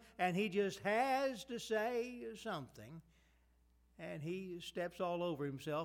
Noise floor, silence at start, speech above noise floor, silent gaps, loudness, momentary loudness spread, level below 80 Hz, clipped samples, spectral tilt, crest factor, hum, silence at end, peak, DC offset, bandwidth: -72 dBFS; 0 s; 32 dB; none; -40 LUFS; 14 LU; -72 dBFS; under 0.1%; -5 dB/octave; 18 dB; none; 0 s; -24 dBFS; under 0.1%; 18.5 kHz